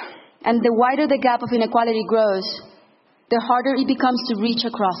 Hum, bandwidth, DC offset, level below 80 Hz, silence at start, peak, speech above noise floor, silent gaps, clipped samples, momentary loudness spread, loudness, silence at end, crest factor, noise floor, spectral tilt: none; 5.8 kHz; under 0.1%; -66 dBFS; 0 s; -4 dBFS; 38 dB; none; under 0.1%; 7 LU; -20 LUFS; 0 s; 16 dB; -57 dBFS; -8.5 dB/octave